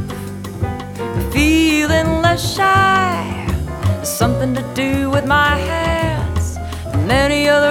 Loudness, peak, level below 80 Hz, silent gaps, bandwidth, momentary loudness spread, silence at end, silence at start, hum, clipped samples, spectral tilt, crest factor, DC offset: -16 LUFS; 0 dBFS; -28 dBFS; none; 18 kHz; 11 LU; 0 s; 0 s; none; under 0.1%; -5 dB/octave; 16 dB; under 0.1%